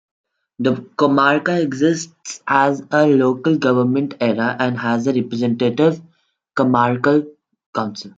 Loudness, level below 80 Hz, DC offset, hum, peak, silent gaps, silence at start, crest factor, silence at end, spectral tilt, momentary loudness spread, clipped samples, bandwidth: -17 LUFS; -64 dBFS; under 0.1%; none; -2 dBFS; 7.66-7.73 s; 0.6 s; 16 dB; 0.1 s; -6 dB/octave; 10 LU; under 0.1%; 7.8 kHz